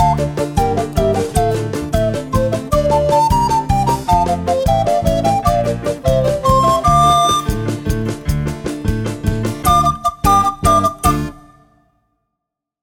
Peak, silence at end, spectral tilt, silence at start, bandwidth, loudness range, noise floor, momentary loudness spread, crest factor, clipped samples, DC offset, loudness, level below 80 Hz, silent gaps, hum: 0 dBFS; 1.45 s; -5.5 dB/octave; 0 s; 18 kHz; 2 LU; -80 dBFS; 8 LU; 14 dB; under 0.1%; under 0.1%; -15 LUFS; -26 dBFS; none; none